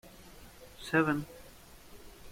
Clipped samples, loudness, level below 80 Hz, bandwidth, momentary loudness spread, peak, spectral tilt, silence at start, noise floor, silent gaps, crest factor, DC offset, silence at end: under 0.1%; -31 LUFS; -58 dBFS; 16.5 kHz; 25 LU; -14 dBFS; -6 dB/octave; 0.05 s; -54 dBFS; none; 24 dB; under 0.1%; 0 s